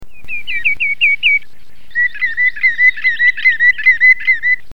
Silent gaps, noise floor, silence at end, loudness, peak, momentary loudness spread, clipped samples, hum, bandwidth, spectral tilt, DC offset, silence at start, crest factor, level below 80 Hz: none; -47 dBFS; 0.15 s; -11 LUFS; 0 dBFS; 8 LU; under 0.1%; none; 6.6 kHz; -0.5 dB/octave; 7%; 0 s; 12 dB; -50 dBFS